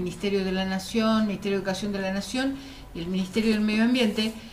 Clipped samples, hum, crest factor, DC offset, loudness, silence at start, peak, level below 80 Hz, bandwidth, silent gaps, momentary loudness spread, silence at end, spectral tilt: under 0.1%; none; 14 dB; under 0.1%; -26 LUFS; 0 s; -12 dBFS; -48 dBFS; 15.5 kHz; none; 8 LU; 0 s; -5.5 dB/octave